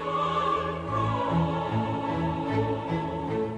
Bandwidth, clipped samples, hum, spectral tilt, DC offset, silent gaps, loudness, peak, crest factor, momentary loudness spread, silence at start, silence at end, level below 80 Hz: 9 kHz; under 0.1%; none; -7.5 dB/octave; under 0.1%; none; -28 LUFS; -14 dBFS; 12 dB; 4 LU; 0 s; 0 s; -52 dBFS